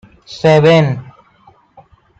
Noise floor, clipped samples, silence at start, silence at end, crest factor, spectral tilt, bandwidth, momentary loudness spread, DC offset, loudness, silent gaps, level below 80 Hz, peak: -49 dBFS; under 0.1%; 0.3 s; 1.15 s; 14 dB; -7 dB/octave; 8 kHz; 18 LU; under 0.1%; -11 LUFS; none; -54 dBFS; -2 dBFS